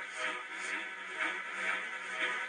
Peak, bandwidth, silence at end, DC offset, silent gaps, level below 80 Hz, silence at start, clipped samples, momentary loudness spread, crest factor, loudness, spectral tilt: -20 dBFS; 11 kHz; 0 s; under 0.1%; none; under -90 dBFS; 0 s; under 0.1%; 4 LU; 18 dB; -36 LUFS; -0.5 dB/octave